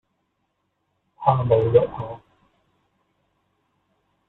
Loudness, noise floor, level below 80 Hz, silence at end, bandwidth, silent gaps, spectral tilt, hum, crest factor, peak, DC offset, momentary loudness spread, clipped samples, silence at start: -20 LUFS; -74 dBFS; -54 dBFS; 2.1 s; 4.1 kHz; none; -10.5 dB/octave; none; 22 dB; -4 dBFS; under 0.1%; 18 LU; under 0.1%; 1.2 s